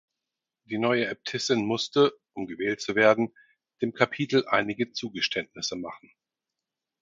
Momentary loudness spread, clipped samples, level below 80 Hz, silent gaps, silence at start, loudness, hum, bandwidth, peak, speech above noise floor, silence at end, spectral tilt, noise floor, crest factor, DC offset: 11 LU; under 0.1%; -68 dBFS; none; 0.7 s; -26 LUFS; none; 7.6 kHz; -2 dBFS; 61 dB; 1.05 s; -4 dB/octave; -88 dBFS; 26 dB; under 0.1%